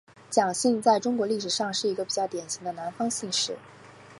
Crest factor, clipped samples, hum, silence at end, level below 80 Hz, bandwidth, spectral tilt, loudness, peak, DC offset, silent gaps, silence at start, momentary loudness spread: 20 dB; under 0.1%; none; 0 s; -76 dBFS; 11.5 kHz; -3 dB/octave; -27 LUFS; -8 dBFS; under 0.1%; none; 0.3 s; 9 LU